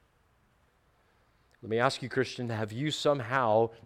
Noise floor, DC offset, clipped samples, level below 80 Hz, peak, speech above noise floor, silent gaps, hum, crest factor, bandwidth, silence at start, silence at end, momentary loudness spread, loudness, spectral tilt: -68 dBFS; under 0.1%; under 0.1%; -68 dBFS; -10 dBFS; 39 dB; none; none; 22 dB; 15 kHz; 1.65 s; 0.1 s; 8 LU; -30 LUFS; -5 dB/octave